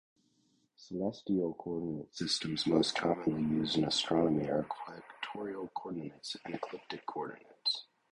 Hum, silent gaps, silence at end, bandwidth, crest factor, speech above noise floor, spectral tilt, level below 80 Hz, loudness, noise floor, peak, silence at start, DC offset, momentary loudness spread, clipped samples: none; none; 0.3 s; 11 kHz; 22 dB; 39 dB; -5 dB/octave; -66 dBFS; -35 LUFS; -74 dBFS; -14 dBFS; 0.8 s; under 0.1%; 13 LU; under 0.1%